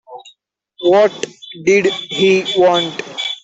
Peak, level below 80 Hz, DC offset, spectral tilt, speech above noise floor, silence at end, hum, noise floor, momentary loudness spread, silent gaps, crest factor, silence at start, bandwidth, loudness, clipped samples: -2 dBFS; -60 dBFS; under 0.1%; -4 dB/octave; 41 dB; 0.05 s; none; -55 dBFS; 10 LU; none; 14 dB; 0.1 s; 8 kHz; -14 LUFS; under 0.1%